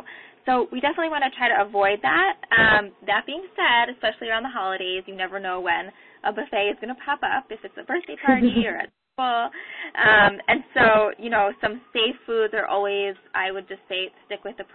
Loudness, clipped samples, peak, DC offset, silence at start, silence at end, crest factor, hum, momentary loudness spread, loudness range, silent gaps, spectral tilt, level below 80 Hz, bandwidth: -22 LUFS; under 0.1%; -4 dBFS; under 0.1%; 0.05 s; 0.1 s; 18 dB; none; 14 LU; 7 LU; none; -8.5 dB/octave; -54 dBFS; 4.4 kHz